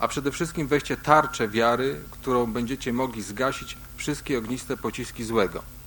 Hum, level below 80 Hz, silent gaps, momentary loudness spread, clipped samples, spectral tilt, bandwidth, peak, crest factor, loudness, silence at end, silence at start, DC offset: none; -46 dBFS; none; 11 LU; under 0.1%; -5 dB/octave; 17 kHz; -2 dBFS; 24 dB; -26 LUFS; 0 s; 0 s; under 0.1%